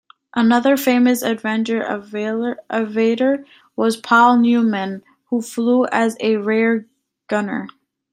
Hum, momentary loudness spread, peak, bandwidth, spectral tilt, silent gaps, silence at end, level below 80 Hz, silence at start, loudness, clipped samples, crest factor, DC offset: none; 11 LU; -2 dBFS; 16 kHz; -5 dB/octave; none; 0.45 s; -68 dBFS; 0.35 s; -18 LUFS; under 0.1%; 16 dB; under 0.1%